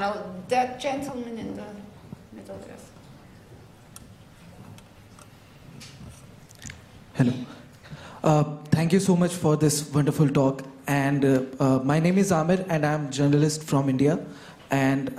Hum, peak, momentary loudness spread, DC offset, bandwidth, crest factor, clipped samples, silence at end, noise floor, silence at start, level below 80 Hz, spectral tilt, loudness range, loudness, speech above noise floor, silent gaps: none; -8 dBFS; 23 LU; under 0.1%; 15 kHz; 18 dB; under 0.1%; 0 s; -49 dBFS; 0 s; -58 dBFS; -6 dB/octave; 22 LU; -24 LUFS; 26 dB; none